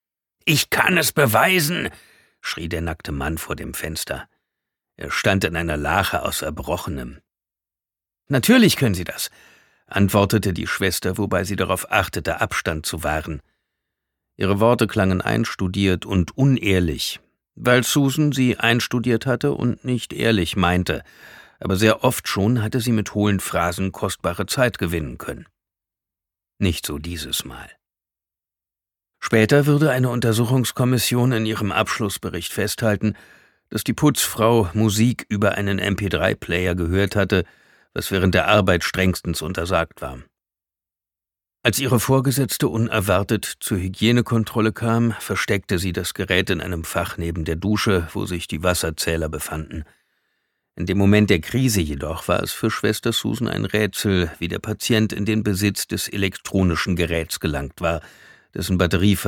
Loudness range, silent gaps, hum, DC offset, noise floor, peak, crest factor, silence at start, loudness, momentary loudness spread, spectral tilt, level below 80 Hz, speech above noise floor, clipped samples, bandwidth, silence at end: 5 LU; none; none; under 0.1%; -90 dBFS; -2 dBFS; 20 dB; 0.45 s; -21 LUFS; 11 LU; -5 dB/octave; -42 dBFS; 69 dB; under 0.1%; 19 kHz; 0 s